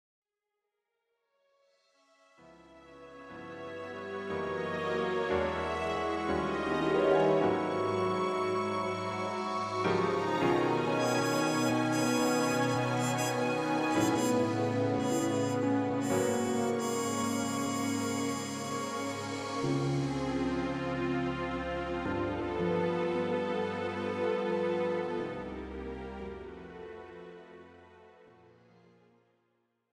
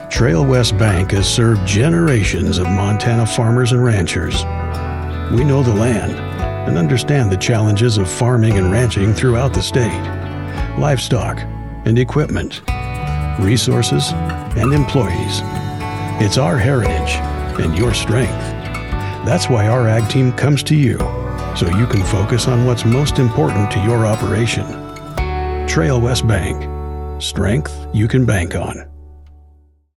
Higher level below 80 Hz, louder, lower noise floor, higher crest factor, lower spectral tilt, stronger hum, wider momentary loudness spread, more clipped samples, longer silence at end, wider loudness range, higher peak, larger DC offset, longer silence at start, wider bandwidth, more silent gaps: second, -58 dBFS vs -28 dBFS; second, -31 LUFS vs -16 LUFS; first, -87 dBFS vs -49 dBFS; about the same, 18 dB vs 16 dB; about the same, -5 dB/octave vs -6 dB/octave; neither; first, 13 LU vs 9 LU; neither; first, 1.8 s vs 0.7 s; first, 13 LU vs 4 LU; second, -14 dBFS vs 0 dBFS; neither; first, 2.45 s vs 0 s; first, 15.5 kHz vs 13 kHz; neither